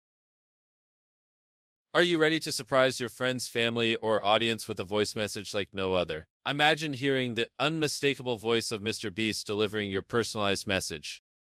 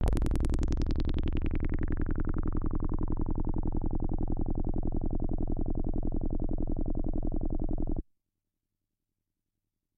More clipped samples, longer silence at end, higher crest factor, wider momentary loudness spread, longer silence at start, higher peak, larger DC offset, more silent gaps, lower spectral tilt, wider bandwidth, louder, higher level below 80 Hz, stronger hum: neither; second, 0.35 s vs 1.95 s; first, 22 dB vs 16 dB; first, 9 LU vs 3 LU; first, 1.95 s vs 0 s; first, -8 dBFS vs -12 dBFS; neither; first, 6.30-6.40 s vs none; second, -4 dB/octave vs -8.5 dB/octave; first, 15 kHz vs 4.9 kHz; first, -29 LUFS vs -35 LUFS; second, -68 dBFS vs -30 dBFS; second, none vs 50 Hz at -95 dBFS